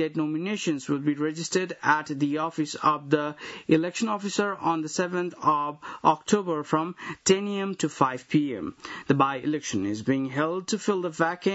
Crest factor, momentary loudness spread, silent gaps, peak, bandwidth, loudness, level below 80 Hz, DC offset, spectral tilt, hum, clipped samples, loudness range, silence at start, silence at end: 22 dB; 5 LU; none; -4 dBFS; 8 kHz; -26 LUFS; -68 dBFS; under 0.1%; -5 dB/octave; none; under 0.1%; 1 LU; 0 s; 0 s